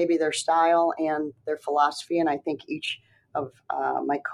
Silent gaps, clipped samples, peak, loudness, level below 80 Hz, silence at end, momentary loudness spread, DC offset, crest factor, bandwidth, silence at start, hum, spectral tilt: none; under 0.1%; -10 dBFS; -26 LUFS; -76 dBFS; 0 s; 12 LU; under 0.1%; 16 dB; 12.5 kHz; 0 s; none; -3.5 dB/octave